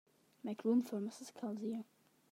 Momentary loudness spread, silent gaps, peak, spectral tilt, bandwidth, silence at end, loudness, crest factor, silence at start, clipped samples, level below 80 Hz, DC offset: 13 LU; none; -24 dBFS; -6.5 dB/octave; 15 kHz; 0.5 s; -41 LUFS; 18 dB; 0.45 s; under 0.1%; under -90 dBFS; under 0.1%